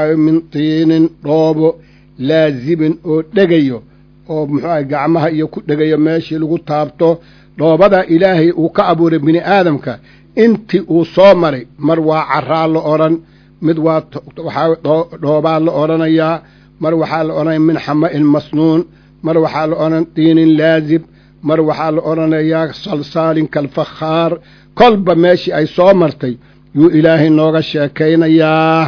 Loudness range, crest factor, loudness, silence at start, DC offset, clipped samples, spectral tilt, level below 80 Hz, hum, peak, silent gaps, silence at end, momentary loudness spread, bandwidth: 4 LU; 12 dB; -12 LUFS; 0 s; under 0.1%; 0.4%; -8.5 dB/octave; -48 dBFS; none; 0 dBFS; none; 0 s; 10 LU; 5.4 kHz